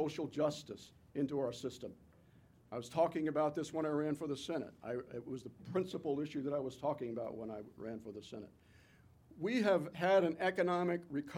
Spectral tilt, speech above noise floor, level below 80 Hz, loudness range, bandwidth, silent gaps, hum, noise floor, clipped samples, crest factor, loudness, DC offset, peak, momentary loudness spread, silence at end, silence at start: -6 dB/octave; 27 dB; -74 dBFS; 6 LU; 15.5 kHz; none; none; -65 dBFS; under 0.1%; 20 dB; -38 LUFS; under 0.1%; -20 dBFS; 15 LU; 0 s; 0 s